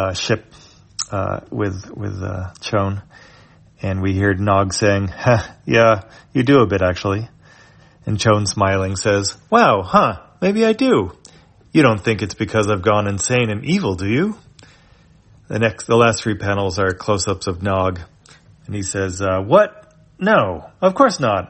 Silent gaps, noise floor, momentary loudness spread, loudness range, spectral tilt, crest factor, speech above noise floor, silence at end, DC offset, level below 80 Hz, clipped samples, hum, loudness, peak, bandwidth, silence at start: none; -50 dBFS; 11 LU; 5 LU; -5.5 dB/octave; 18 dB; 33 dB; 0.05 s; under 0.1%; -48 dBFS; under 0.1%; none; -18 LUFS; 0 dBFS; 8.8 kHz; 0 s